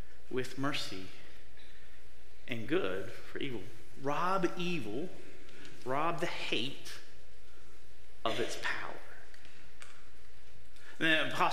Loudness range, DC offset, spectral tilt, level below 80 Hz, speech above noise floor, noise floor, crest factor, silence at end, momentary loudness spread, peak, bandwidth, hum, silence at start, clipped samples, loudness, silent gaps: 6 LU; 3%; -4.5 dB/octave; -62 dBFS; 23 dB; -59 dBFS; 24 dB; 0 s; 23 LU; -14 dBFS; 16 kHz; none; 0 s; under 0.1%; -36 LUFS; none